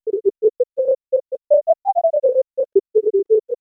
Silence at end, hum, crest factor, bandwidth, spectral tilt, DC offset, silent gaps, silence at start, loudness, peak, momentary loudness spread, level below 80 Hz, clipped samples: 0.05 s; none; 14 dB; 1.3 kHz; -10.5 dB/octave; under 0.1%; none; 0.05 s; -19 LUFS; -4 dBFS; 4 LU; -72 dBFS; under 0.1%